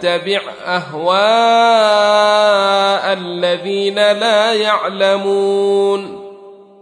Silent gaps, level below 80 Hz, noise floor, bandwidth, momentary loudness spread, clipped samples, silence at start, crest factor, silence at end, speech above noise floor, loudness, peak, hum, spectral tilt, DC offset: none; -70 dBFS; -38 dBFS; 10.5 kHz; 9 LU; under 0.1%; 0 s; 12 dB; 0.25 s; 25 dB; -13 LUFS; 0 dBFS; none; -3.5 dB/octave; under 0.1%